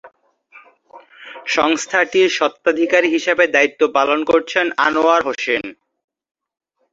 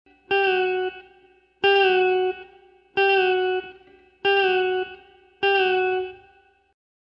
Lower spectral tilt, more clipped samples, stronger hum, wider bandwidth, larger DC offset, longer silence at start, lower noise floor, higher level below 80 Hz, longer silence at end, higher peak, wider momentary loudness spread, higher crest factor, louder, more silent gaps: second, -2.5 dB/octave vs -5 dB/octave; neither; neither; first, 8 kHz vs 5.6 kHz; neither; second, 0.05 s vs 0.3 s; second, -48 dBFS vs -58 dBFS; about the same, -60 dBFS vs -64 dBFS; first, 1.2 s vs 1.05 s; first, 0 dBFS vs -8 dBFS; second, 6 LU vs 11 LU; about the same, 18 dB vs 16 dB; first, -16 LUFS vs -21 LUFS; neither